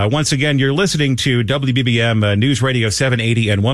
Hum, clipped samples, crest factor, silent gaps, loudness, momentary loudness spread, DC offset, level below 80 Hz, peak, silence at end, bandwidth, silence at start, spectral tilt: none; under 0.1%; 12 dB; none; -15 LUFS; 1 LU; 0.4%; -42 dBFS; -4 dBFS; 0 s; 13 kHz; 0 s; -5 dB/octave